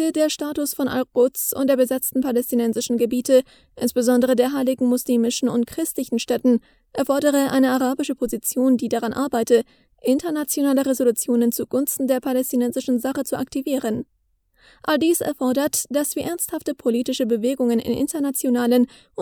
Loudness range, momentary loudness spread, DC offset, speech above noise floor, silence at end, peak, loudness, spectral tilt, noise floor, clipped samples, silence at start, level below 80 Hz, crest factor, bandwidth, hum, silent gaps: 3 LU; 6 LU; under 0.1%; 43 dB; 0 s; -4 dBFS; -21 LUFS; -3.5 dB/octave; -64 dBFS; under 0.1%; 0 s; -58 dBFS; 16 dB; 19.5 kHz; none; none